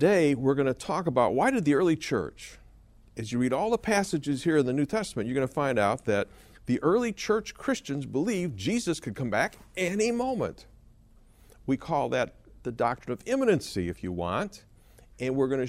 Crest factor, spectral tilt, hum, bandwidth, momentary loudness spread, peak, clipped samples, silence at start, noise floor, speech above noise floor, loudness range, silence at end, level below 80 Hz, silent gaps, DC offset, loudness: 18 dB; -5.5 dB/octave; none; 15 kHz; 10 LU; -10 dBFS; under 0.1%; 0 s; -56 dBFS; 29 dB; 4 LU; 0 s; -54 dBFS; none; under 0.1%; -28 LUFS